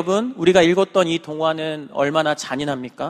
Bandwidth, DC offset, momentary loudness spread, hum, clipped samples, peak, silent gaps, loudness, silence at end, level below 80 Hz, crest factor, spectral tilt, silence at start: 12.5 kHz; under 0.1%; 10 LU; none; under 0.1%; 0 dBFS; none; -19 LUFS; 0 s; -56 dBFS; 18 dB; -5 dB/octave; 0 s